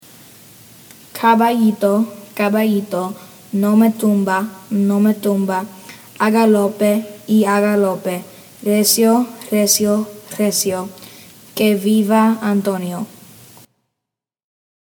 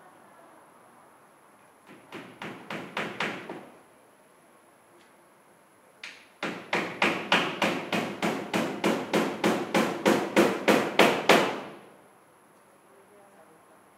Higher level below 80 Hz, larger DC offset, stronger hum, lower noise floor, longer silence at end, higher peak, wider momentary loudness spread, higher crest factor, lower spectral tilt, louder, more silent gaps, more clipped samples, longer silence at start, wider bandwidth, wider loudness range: first, -66 dBFS vs -74 dBFS; neither; neither; first, -83 dBFS vs -58 dBFS; second, 1.8 s vs 2.1 s; first, 0 dBFS vs -4 dBFS; second, 14 LU vs 22 LU; second, 16 dB vs 26 dB; about the same, -4.5 dB/octave vs -4 dB/octave; first, -16 LUFS vs -26 LUFS; neither; neither; second, 1.15 s vs 1.9 s; first, over 20 kHz vs 16 kHz; second, 3 LU vs 15 LU